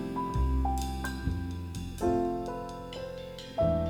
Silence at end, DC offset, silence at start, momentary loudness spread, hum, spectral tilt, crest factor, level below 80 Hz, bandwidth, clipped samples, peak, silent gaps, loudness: 0 s; under 0.1%; 0 s; 10 LU; none; -7 dB/octave; 16 dB; -36 dBFS; 17 kHz; under 0.1%; -16 dBFS; none; -33 LUFS